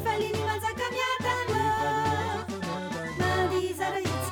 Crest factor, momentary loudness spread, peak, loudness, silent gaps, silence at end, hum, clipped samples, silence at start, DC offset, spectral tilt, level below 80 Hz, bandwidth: 14 dB; 6 LU; -16 dBFS; -28 LUFS; none; 0 s; none; under 0.1%; 0 s; under 0.1%; -4.5 dB/octave; -56 dBFS; over 20 kHz